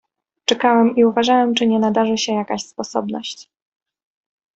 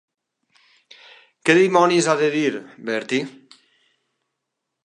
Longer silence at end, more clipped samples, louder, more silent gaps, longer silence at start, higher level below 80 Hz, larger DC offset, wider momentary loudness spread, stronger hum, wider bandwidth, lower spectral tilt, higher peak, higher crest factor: second, 1.15 s vs 1.55 s; neither; about the same, -18 LUFS vs -19 LUFS; neither; second, 0.5 s vs 1.45 s; first, -62 dBFS vs -78 dBFS; neither; about the same, 12 LU vs 12 LU; neither; second, 8.2 kHz vs 11 kHz; about the same, -4 dB/octave vs -4.5 dB/octave; about the same, -2 dBFS vs -2 dBFS; about the same, 16 dB vs 20 dB